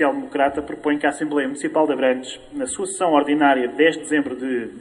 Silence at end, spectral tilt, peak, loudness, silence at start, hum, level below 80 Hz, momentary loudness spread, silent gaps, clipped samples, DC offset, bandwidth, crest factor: 0 s; -3.5 dB/octave; -2 dBFS; -20 LUFS; 0 s; none; -58 dBFS; 9 LU; none; under 0.1%; under 0.1%; 11.5 kHz; 18 dB